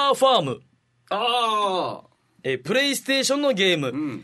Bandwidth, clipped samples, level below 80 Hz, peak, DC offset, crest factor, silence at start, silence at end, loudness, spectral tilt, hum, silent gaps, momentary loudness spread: 12.5 kHz; under 0.1%; -72 dBFS; -6 dBFS; under 0.1%; 18 dB; 0 s; 0 s; -22 LUFS; -3 dB/octave; none; none; 12 LU